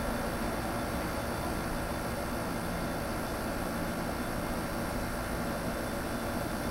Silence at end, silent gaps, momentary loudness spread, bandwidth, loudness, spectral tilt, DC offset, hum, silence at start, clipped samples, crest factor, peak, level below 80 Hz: 0 s; none; 1 LU; 16 kHz; -34 LUFS; -5 dB/octave; under 0.1%; none; 0 s; under 0.1%; 14 dB; -20 dBFS; -42 dBFS